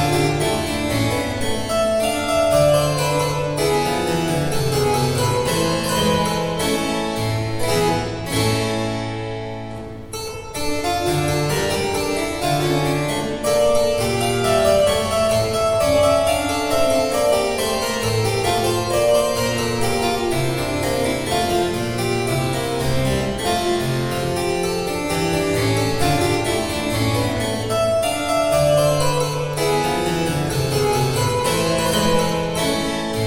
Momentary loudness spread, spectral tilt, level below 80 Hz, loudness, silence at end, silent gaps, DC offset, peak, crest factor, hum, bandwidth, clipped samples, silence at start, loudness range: 5 LU; -4.5 dB/octave; -38 dBFS; -19 LUFS; 0 s; none; 0.2%; -4 dBFS; 16 dB; none; 17 kHz; under 0.1%; 0 s; 4 LU